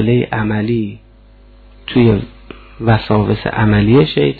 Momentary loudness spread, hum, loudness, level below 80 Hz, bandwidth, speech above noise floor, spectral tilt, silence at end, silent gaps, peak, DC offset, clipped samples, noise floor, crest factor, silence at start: 10 LU; none; -14 LUFS; -34 dBFS; 4.7 kHz; 30 dB; -10.5 dB/octave; 0 s; none; 0 dBFS; under 0.1%; under 0.1%; -43 dBFS; 14 dB; 0 s